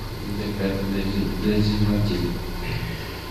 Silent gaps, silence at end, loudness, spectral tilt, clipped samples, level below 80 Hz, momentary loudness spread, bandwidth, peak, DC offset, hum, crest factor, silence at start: none; 0 s; -25 LUFS; -6.5 dB/octave; under 0.1%; -32 dBFS; 9 LU; 14 kHz; -8 dBFS; under 0.1%; none; 16 dB; 0 s